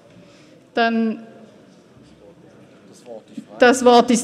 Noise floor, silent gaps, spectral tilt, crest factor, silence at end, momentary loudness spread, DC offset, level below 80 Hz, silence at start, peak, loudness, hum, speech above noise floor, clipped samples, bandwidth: -48 dBFS; none; -3.5 dB/octave; 20 dB; 0 s; 25 LU; under 0.1%; -62 dBFS; 0.75 s; -2 dBFS; -16 LUFS; none; 32 dB; under 0.1%; 13.5 kHz